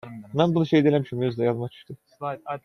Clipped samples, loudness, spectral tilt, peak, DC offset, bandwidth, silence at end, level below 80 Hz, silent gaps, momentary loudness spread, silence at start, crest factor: under 0.1%; -24 LUFS; -8.5 dB/octave; -6 dBFS; under 0.1%; 10 kHz; 0.05 s; -64 dBFS; none; 15 LU; 0.05 s; 18 dB